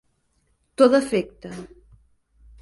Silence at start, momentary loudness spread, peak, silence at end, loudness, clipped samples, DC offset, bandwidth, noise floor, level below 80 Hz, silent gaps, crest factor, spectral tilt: 0.8 s; 22 LU; -2 dBFS; 0.95 s; -19 LUFS; under 0.1%; under 0.1%; 11.5 kHz; -68 dBFS; -56 dBFS; none; 22 dB; -5.5 dB/octave